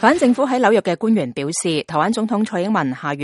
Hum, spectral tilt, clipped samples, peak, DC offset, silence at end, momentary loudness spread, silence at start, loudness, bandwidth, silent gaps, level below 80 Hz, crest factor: none; -5 dB/octave; under 0.1%; 0 dBFS; under 0.1%; 0 s; 5 LU; 0 s; -18 LUFS; 11.5 kHz; none; -60 dBFS; 18 dB